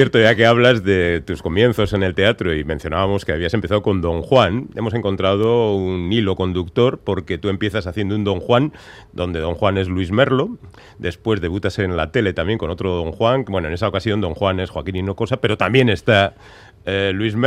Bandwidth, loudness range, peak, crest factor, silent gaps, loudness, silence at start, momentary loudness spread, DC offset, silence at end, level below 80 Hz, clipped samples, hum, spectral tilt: 13 kHz; 3 LU; 0 dBFS; 18 dB; none; -18 LUFS; 0 s; 8 LU; under 0.1%; 0 s; -42 dBFS; under 0.1%; none; -7 dB/octave